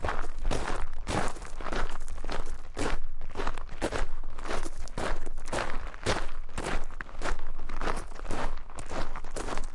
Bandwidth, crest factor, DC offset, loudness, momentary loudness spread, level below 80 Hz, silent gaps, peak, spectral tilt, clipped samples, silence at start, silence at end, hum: 11 kHz; 12 dB; under 0.1%; -36 LUFS; 7 LU; -32 dBFS; none; -12 dBFS; -4.5 dB/octave; under 0.1%; 0 s; 0 s; none